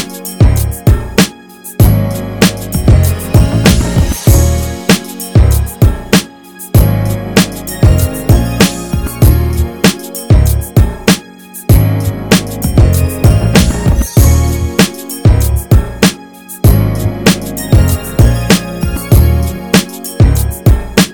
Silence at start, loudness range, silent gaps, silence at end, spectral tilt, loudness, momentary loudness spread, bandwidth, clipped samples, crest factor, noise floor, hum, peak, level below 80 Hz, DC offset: 0 s; 1 LU; none; 0 s; -5.5 dB/octave; -11 LUFS; 6 LU; 19.5 kHz; 0.4%; 10 dB; -31 dBFS; none; 0 dBFS; -16 dBFS; 0.8%